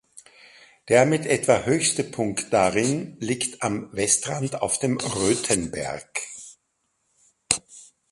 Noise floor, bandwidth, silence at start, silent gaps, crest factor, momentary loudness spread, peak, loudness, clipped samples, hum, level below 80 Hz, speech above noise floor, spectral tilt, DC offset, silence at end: -73 dBFS; 12 kHz; 0.15 s; none; 24 dB; 11 LU; 0 dBFS; -23 LUFS; under 0.1%; none; -56 dBFS; 50 dB; -3.5 dB/octave; under 0.1%; 0.3 s